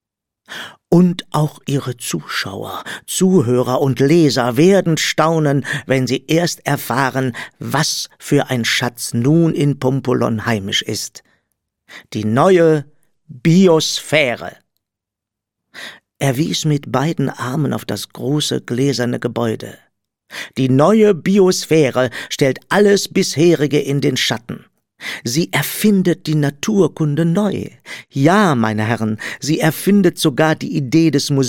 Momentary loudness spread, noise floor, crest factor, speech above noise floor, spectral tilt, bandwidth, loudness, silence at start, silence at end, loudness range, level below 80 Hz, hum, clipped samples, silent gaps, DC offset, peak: 13 LU; -83 dBFS; 16 dB; 68 dB; -5.5 dB/octave; 17.5 kHz; -16 LUFS; 0.5 s; 0 s; 5 LU; -56 dBFS; none; under 0.1%; none; under 0.1%; 0 dBFS